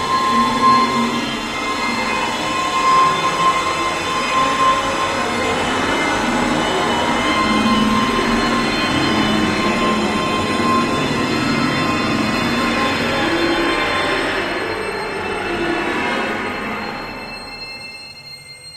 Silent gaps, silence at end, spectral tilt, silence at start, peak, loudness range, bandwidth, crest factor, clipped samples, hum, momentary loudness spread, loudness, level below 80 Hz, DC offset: none; 0 s; -4 dB/octave; 0 s; -2 dBFS; 5 LU; 15 kHz; 16 dB; under 0.1%; none; 8 LU; -17 LUFS; -40 dBFS; under 0.1%